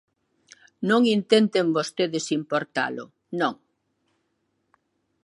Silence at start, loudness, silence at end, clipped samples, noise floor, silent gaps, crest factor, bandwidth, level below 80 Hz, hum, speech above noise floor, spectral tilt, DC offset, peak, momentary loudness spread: 0.8 s; -24 LUFS; 1.7 s; under 0.1%; -74 dBFS; none; 22 dB; 11.5 kHz; -78 dBFS; none; 51 dB; -4.5 dB/octave; under 0.1%; -4 dBFS; 10 LU